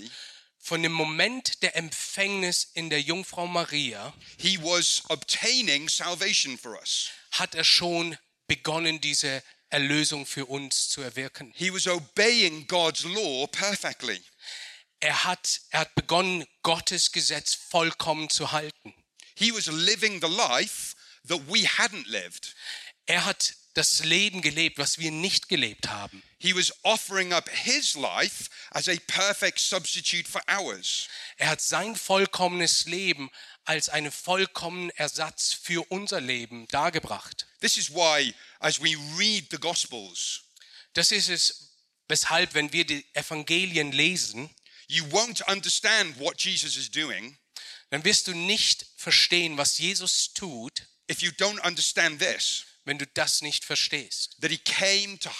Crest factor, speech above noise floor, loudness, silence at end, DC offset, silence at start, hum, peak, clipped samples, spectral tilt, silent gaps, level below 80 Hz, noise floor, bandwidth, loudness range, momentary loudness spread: 22 dB; 26 dB; -25 LUFS; 0 s; under 0.1%; 0 s; none; -6 dBFS; under 0.1%; -1.5 dB/octave; none; -66 dBFS; -53 dBFS; 15.5 kHz; 3 LU; 11 LU